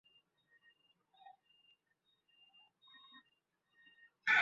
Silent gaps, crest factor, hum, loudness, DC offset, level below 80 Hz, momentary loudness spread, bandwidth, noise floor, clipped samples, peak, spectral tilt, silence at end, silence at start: none; 26 dB; none; -35 LUFS; under 0.1%; under -90 dBFS; 25 LU; 5.6 kHz; -82 dBFS; under 0.1%; -20 dBFS; 3 dB/octave; 0 s; 4.25 s